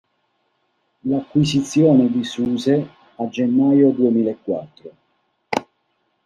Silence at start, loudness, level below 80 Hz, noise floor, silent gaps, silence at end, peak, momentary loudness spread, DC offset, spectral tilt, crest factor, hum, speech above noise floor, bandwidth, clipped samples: 1.05 s; -19 LUFS; -58 dBFS; -68 dBFS; none; 0.65 s; -2 dBFS; 13 LU; under 0.1%; -6.5 dB/octave; 18 dB; none; 51 dB; 10.5 kHz; under 0.1%